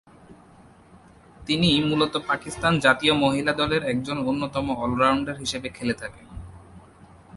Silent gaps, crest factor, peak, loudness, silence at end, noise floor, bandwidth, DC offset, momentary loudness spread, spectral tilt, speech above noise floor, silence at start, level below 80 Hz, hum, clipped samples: none; 22 dB; -4 dBFS; -23 LUFS; 0 s; -51 dBFS; 11.5 kHz; under 0.1%; 12 LU; -5 dB/octave; 28 dB; 0.3 s; -48 dBFS; none; under 0.1%